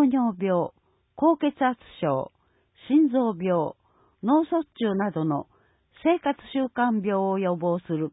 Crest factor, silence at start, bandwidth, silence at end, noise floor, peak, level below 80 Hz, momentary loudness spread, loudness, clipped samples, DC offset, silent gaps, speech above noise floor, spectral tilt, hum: 16 dB; 0 s; 4 kHz; 0.05 s; -59 dBFS; -10 dBFS; -66 dBFS; 7 LU; -25 LUFS; under 0.1%; under 0.1%; none; 35 dB; -11.5 dB/octave; none